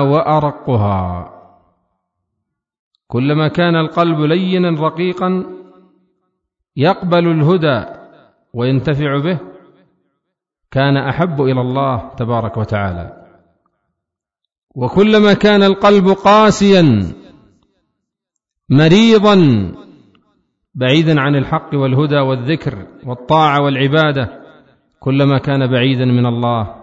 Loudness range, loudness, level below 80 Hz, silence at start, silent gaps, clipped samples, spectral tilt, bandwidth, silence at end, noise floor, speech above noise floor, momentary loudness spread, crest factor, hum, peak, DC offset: 8 LU; -13 LUFS; -44 dBFS; 0 s; 2.79-2.91 s, 14.58-14.67 s; under 0.1%; -7 dB/octave; 7.8 kHz; 0.05 s; -80 dBFS; 67 dB; 14 LU; 14 dB; none; 0 dBFS; under 0.1%